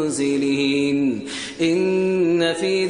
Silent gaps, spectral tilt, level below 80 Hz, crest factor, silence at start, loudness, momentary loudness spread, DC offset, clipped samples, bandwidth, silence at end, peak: none; -5 dB/octave; -60 dBFS; 14 dB; 0 s; -20 LUFS; 4 LU; under 0.1%; under 0.1%; 10.5 kHz; 0 s; -6 dBFS